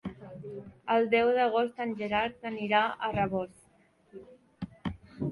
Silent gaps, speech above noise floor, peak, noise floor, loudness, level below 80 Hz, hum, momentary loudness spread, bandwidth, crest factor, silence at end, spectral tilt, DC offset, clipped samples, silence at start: none; 36 dB; -12 dBFS; -65 dBFS; -29 LUFS; -58 dBFS; none; 18 LU; 11.5 kHz; 18 dB; 0 s; -7 dB/octave; under 0.1%; under 0.1%; 0.05 s